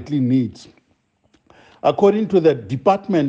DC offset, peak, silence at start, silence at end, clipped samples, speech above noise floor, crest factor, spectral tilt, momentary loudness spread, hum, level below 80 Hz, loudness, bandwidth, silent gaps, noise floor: under 0.1%; -4 dBFS; 0 s; 0 s; under 0.1%; 46 dB; 16 dB; -8 dB/octave; 6 LU; none; -58 dBFS; -18 LUFS; 8 kHz; none; -63 dBFS